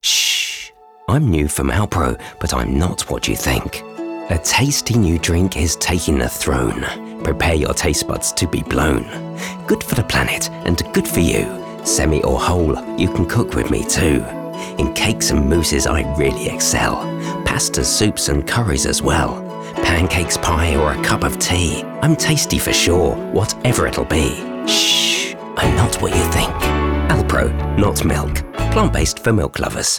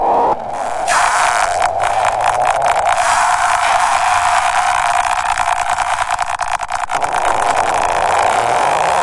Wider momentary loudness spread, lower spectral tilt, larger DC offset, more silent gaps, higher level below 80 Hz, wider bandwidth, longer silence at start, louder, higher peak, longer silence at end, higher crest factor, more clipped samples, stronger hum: about the same, 7 LU vs 5 LU; first, -4 dB/octave vs -1.5 dB/octave; first, 0.2% vs under 0.1%; neither; first, -28 dBFS vs -40 dBFS; first, over 20 kHz vs 11.5 kHz; about the same, 0.05 s vs 0 s; second, -17 LUFS vs -14 LUFS; second, -6 dBFS vs 0 dBFS; about the same, 0 s vs 0 s; about the same, 12 dB vs 14 dB; neither; neither